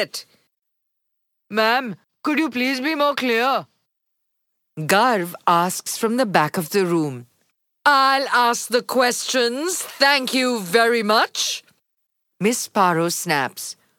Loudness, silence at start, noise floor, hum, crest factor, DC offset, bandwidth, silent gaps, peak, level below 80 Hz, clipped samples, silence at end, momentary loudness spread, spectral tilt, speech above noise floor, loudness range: -19 LUFS; 0 s; -76 dBFS; none; 20 dB; under 0.1%; 19 kHz; none; -2 dBFS; -78 dBFS; under 0.1%; 0.25 s; 10 LU; -3 dB/octave; 56 dB; 3 LU